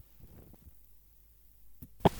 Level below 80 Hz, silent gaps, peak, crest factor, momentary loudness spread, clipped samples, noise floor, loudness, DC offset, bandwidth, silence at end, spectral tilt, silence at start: -54 dBFS; none; -10 dBFS; 28 dB; 9 LU; under 0.1%; -60 dBFS; -31 LUFS; under 0.1%; 19.5 kHz; 0 s; -7 dB/octave; 2.05 s